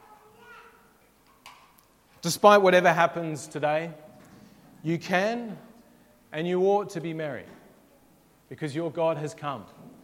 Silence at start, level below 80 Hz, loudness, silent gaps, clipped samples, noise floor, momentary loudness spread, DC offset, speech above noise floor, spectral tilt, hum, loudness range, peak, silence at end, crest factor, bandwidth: 0.5 s; -72 dBFS; -25 LUFS; none; under 0.1%; -60 dBFS; 19 LU; under 0.1%; 35 dB; -5 dB/octave; none; 8 LU; -4 dBFS; 0.15 s; 24 dB; 16.5 kHz